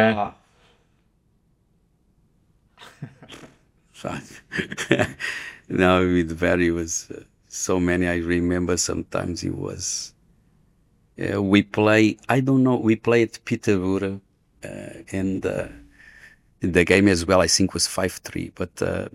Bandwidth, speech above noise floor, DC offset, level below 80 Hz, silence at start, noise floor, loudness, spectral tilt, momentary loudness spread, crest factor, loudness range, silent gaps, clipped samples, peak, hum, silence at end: 16 kHz; 42 dB; under 0.1%; -54 dBFS; 0 s; -64 dBFS; -22 LUFS; -4.5 dB/octave; 19 LU; 22 dB; 9 LU; none; under 0.1%; -2 dBFS; none; 0.05 s